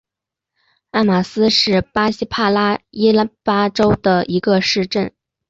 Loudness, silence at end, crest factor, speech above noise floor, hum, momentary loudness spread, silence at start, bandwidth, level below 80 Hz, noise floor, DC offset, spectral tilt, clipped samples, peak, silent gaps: -16 LUFS; 0.4 s; 14 dB; 69 dB; none; 5 LU; 0.95 s; 7.8 kHz; -46 dBFS; -85 dBFS; under 0.1%; -5.5 dB/octave; under 0.1%; -2 dBFS; none